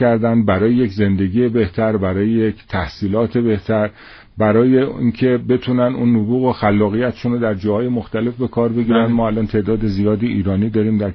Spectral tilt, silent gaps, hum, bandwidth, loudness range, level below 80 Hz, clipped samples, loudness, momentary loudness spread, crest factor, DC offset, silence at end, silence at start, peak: -7.5 dB/octave; none; none; 6 kHz; 2 LU; -40 dBFS; under 0.1%; -17 LUFS; 5 LU; 14 dB; under 0.1%; 0 s; 0 s; -2 dBFS